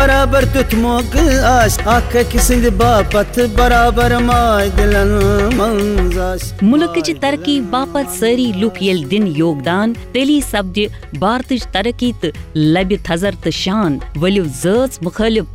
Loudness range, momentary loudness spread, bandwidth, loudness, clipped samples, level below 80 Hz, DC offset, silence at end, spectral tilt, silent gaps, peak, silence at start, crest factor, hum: 4 LU; 6 LU; 16 kHz; -14 LUFS; under 0.1%; -22 dBFS; 0.1%; 0 s; -5 dB/octave; none; -2 dBFS; 0 s; 12 dB; none